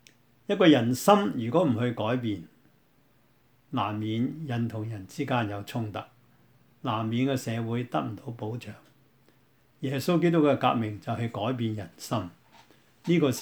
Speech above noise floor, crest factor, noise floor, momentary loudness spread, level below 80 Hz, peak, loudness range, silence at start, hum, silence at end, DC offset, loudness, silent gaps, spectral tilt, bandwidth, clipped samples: 38 dB; 24 dB; -65 dBFS; 15 LU; -70 dBFS; -4 dBFS; 7 LU; 0.5 s; none; 0 s; under 0.1%; -28 LUFS; none; -6.5 dB/octave; over 20 kHz; under 0.1%